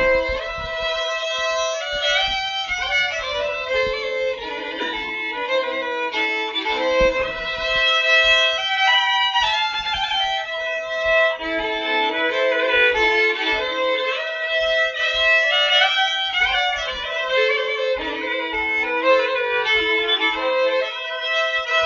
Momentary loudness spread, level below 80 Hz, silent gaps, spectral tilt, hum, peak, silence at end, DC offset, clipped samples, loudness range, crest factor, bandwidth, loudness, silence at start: 9 LU; -44 dBFS; none; 2 dB/octave; none; -4 dBFS; 0 s; under 0.1%; under 0.1%; 5 LU; 16 dB; 7.6 kHz; -19 LUFS; 0 s